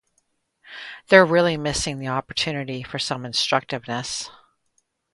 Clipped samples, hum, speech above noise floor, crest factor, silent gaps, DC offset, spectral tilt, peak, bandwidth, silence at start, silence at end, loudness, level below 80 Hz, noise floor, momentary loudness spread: under 0.1%; none; 48 dB; 24 dB; none; under 0.1%; -4 dB/octave; 0 dBFS; 11.5 kHz; 0.65 s; 0.85 s; -21 LUFS; -50 dBFS; -70 dBFS; 21 LU